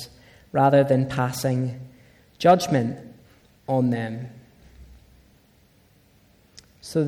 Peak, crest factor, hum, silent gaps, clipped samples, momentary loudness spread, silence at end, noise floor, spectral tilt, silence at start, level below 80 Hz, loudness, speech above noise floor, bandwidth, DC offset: -6 dBFS; 18 dB; none; none; under 0.1%; 23 LU; 0 s; -58 dBFS; -6.5 dB/octave; 0 s; -56 dBFS; -22 LUFS; 37 dB; 16 kHz; under 0.1%